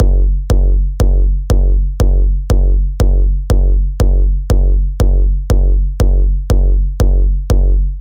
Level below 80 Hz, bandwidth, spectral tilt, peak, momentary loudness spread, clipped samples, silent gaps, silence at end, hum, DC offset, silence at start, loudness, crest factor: -10 dBFS; 8.6 kHz; -7.5 dB/octave; 0 dBFS; 2 LU; under 0.1%; none; 0 s; none; 0.4%; 0 s; -15 LUFS; 10 dB